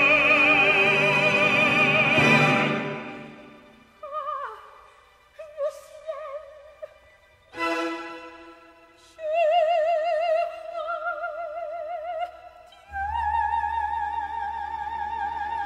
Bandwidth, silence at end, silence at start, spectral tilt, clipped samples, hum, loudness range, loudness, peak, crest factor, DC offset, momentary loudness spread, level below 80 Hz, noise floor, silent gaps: 14 kHz; 0 s; 0 s; -4.5 dB/octave; under 0.1%; none; 17 LU; -22 LUFS; -6 dBFS; 20 dB; under 0.1%; 21 LU; -52 dBFS; -56 dBFS; none